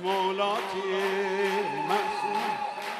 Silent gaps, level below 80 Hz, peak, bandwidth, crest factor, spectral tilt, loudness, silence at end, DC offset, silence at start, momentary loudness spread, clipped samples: none; -76 dBFS; -14 dBFS; 14 kHz; 14 dB; -4 dB/octave; -28 LUFS; 0 s; under 0.1%; 0 s; 3 LU; under 0.1%